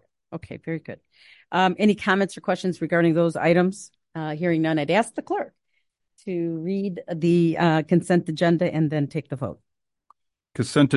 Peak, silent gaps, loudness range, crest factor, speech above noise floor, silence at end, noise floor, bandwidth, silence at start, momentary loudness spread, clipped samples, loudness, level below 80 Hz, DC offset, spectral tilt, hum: -6 dBFS; none; 3 LU; 18 dB; 52 dB; 0 s; -74 dBFS; 11.5 kHz; 0.3 s; 17 LU; under 0.1%; -23 LUFS; -62 dBFS; under 0.1%; -6.5 dB/octave; none